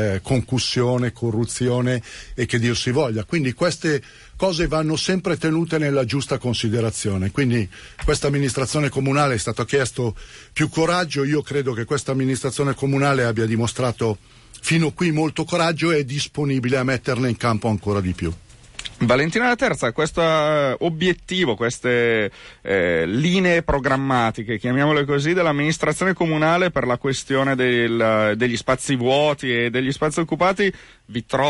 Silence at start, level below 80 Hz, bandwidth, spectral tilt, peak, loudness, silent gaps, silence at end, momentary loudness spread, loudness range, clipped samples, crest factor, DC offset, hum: 0 s; -42 dBFS; 11.5 kHz; -5.5 dB/octave; -8 dBFS; -20 LUFS; none; 0 s; 6 LU; 3 LU; under 0.1%; 14 dB; under 0.1%; none